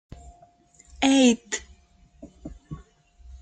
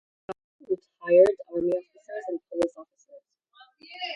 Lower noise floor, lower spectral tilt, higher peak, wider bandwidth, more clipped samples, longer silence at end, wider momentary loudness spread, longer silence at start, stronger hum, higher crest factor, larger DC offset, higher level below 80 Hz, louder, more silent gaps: about the same, -57 dBFS vs -58 dBFS; second, -3 dB/octave vs -5.5 dB/octave; about the same, -6 dBFS vs -6 dBFS; second, 9.4 kHz vs 11 kHz; neither; about the same, 0.05 s vs 0 s; first, 26 LU vs 23 LU; first, 1 s vs 0.3 s; neither; about the same, 22 dB vs 20 dB; neither; first, -50 dBFS vs -68 dBFS; first, -22 LUFS vs -26 LUFS; second, none vs 0.44-0.59 s